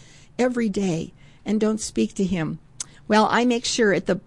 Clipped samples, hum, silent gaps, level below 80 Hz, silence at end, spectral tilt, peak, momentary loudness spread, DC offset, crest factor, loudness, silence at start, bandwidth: under 0.1%; none; none; -50 dBFS; 0.05 s; -4.5 dB/octave; -8 dBFS; 16 LU; 0.2%; 16 dB; -22 LUFS; 0.4 s; 11.5 kHz